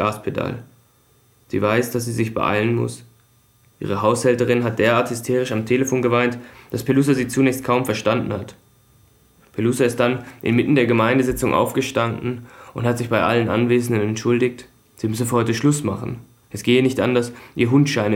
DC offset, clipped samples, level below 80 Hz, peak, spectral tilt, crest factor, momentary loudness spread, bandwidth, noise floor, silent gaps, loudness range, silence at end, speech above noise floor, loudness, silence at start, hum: under 0.1%; under 0.1%; -52 dBFS; -2 dBFS; -6 dB/octave; 18 dB; 12 LU; 17 kHz; -57 dBFS; none; 3 LU; 0 s; 38 dB; -20 LUFS; 0 s; none